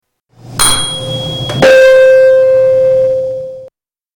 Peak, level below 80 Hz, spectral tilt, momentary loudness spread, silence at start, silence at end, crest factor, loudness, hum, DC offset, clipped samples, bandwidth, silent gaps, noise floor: -2 dBFS; -36 dBFS; -2.5 dB/octave; 14 LU; 0.45 s; 0.5 s; 8 dB; -8 LUFS; none; under 0.1%; under 0.1%; 18 kHz; none; -41 dBFS